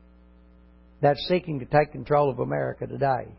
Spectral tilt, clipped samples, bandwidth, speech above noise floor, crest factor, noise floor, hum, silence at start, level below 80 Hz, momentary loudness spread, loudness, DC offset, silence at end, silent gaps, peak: -11 dB/octave; under 0.1%; 5.8 kHz; 29 dB; 18 dB; -53 dBFS; 60 Hz at -50 dBFS; 1 s; -52 dBFS; 5 LU; -25 LUFS; under 0.1%; 0.05 s; none; -8 dBFS